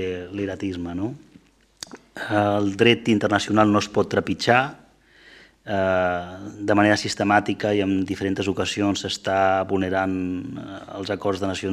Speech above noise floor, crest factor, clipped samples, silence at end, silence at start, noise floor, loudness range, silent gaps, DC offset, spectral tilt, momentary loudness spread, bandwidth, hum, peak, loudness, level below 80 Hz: 32 dB; 22 dB; under 0.1%; 0 s; 0 s; -54 dBFS; 3 LU; none; under 0.1%; -5 dB/octave; 15 LU; 13 kHz; none; -2 dBFS; -22 LUFS; -58 dBFS